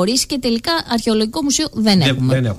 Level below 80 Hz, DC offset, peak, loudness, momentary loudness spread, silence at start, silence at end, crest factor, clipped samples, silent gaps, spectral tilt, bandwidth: -42 dBFS; under 0.1%; -4 dBFS; -16 LUFS; 4 LU; 0 s; 0 s; 14 dB; under 0.1%; none; -4.5 dB/octave; 15.5 kHz